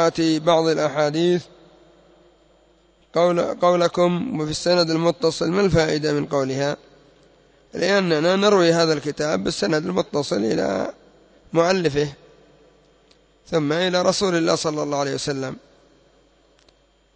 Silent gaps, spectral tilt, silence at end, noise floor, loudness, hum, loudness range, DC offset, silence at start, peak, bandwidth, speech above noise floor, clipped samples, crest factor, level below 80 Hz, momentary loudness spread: none; -5 dB/octave; 1.55 s; -58 dBFS; -20 LUFS; none; 4 LU; under 0.1%; 0 s; -4 dBFS; 8 kHz; 38 dB; under 0.1%; 16 dB; -52 dBFS; 7 LU